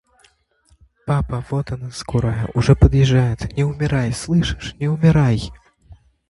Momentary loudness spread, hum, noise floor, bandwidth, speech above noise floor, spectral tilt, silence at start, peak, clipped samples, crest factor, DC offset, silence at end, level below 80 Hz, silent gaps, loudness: 11 LU; none; -58 dBFS; 11.5 kHz; 41 dB; -7 dB/octave; 1.05 s; 0 dBFS; under 0.1%; 18 dB; under 0.1%; 0.75 s; -30 dBFS; none; -19 LUFS